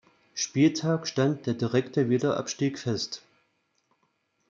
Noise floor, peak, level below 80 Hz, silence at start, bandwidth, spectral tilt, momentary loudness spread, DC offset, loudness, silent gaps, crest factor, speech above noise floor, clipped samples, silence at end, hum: -73 dBFS; -10 dBFS; -70 dBFS; 0.35 s; 7.6 kHz; -5.5 dB/octave; 9 LU; under 0.1%; -27 LUFS; none; 18 dB; 47 dB; under 0.1%; 1.35 s; none